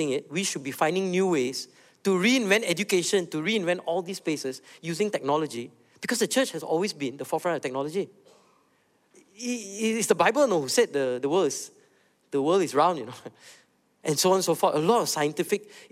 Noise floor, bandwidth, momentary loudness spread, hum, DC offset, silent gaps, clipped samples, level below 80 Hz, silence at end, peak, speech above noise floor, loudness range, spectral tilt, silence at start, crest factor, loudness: -67 dBFS; 16 kHz; 13 LU; none; under 0.1%; none; under 0.1%; -78 dBFS; 0.05 s; -6 dBFS; 41 dB; 4 LU; -3.5 dB/octave; 0 s; 20 dB; -26 LUFS